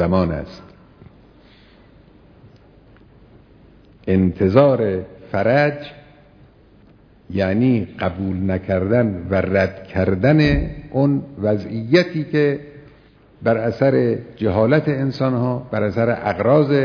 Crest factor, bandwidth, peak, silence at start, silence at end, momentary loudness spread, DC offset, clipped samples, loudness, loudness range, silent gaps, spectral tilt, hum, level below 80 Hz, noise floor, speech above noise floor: 20 dB; 5.4 kHz; 0 dBFS; 0 s; 0 s; 9 LU; under 0.1%; under 0.1%; -19 LUFS; 4 LU; none; -9 dB/octave; none; -40 dBFS; -49 dBFS; 32 dB